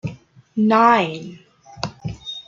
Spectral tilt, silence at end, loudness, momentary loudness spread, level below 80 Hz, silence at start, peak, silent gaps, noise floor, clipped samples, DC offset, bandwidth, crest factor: -6 dB/octave; 0.05 s; -18 LUFS; 19 LU; -52 dBFS; 0.05 s; -2 dBFS; none; -39 dBFS; under 0.1%; under 0.1%; 7.4 kHz; 18 dB